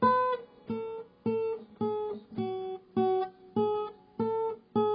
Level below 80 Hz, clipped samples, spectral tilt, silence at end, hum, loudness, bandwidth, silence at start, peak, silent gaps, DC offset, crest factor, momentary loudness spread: -70 dBFS; under 0.1%; -10.5 dB/octave; 0 s; none; -33 LUFS; 5.2 kHz; 0 s; -14 dBFS; none; under 0.1%; 18 dB; 9 LU